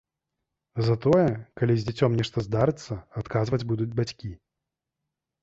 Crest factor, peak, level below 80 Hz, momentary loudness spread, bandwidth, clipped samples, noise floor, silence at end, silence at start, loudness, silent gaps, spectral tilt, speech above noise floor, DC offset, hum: 18 dB; -8 dBFS; -52 dBFS; 14 LU; 7.8 kHz; under 0.1%; -86 dBFS; 1.05 s; 0.75 s; -26 LUFS; none; -7.5 dB/octave; 61 dB; under 0.1%; none